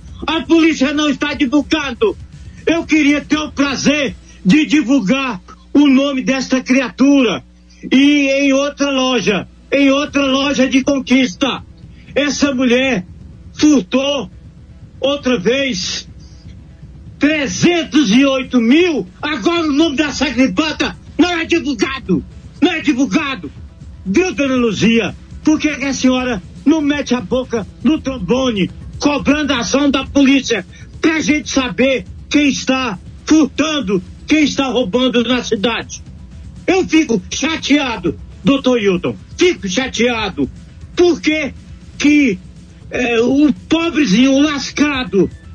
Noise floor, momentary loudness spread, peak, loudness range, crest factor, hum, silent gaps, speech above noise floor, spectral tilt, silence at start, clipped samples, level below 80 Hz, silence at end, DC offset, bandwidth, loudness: -37 dBFS; 9 LU; -2 dBFS; 3 LU; 14 dB; none; none; 23 dB; -4.5 dB/octave; 0 s; under 0.1%; -38 dBFS; 0 s; under 0.1%; 7.6 kHz; -15 LUFS